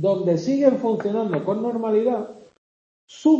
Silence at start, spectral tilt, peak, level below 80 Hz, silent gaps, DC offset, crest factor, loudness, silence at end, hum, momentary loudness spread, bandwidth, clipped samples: 0 s; -7.5 dB/octave; -4 dBFS; -70 dBFS; 2.58-3.08 s; under 0.1%; 18 dB; -22 LUFS; 0 s; none; 6 LU; 7.6 kHz; under 0.1%